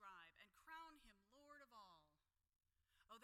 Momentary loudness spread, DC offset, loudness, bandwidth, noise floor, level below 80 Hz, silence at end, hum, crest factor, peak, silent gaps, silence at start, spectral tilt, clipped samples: 8 LU; under 0.1%; -64 LUFS; 14.5 kHz; -87 dBFS; -86 dBFS; 0 s; none; 18 dB; -48 dBFS; none; 0 s; -2.5 dB/octave; under 0.1%